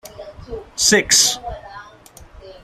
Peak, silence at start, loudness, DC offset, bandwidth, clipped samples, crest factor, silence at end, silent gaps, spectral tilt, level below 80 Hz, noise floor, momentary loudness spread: 0 dBFS; 0.05 s; -14 LUFS; under 0.1%; 15.5 kHz; under 0.1%; 20 dB; 0.1 s; none; -0.5 dB/octave; -44 dBFS; -44 dBFS; 25 LU